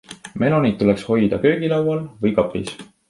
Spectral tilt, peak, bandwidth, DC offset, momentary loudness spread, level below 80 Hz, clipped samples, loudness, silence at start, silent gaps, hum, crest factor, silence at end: -7.5 dB/octave; -2 dBFS; 11.5 kHz; under 0.1%; 9 LU; -48 dBFS; under 0.1%; -19 LUFS; 0.1 s; none; none; 18 dB; 0.25 s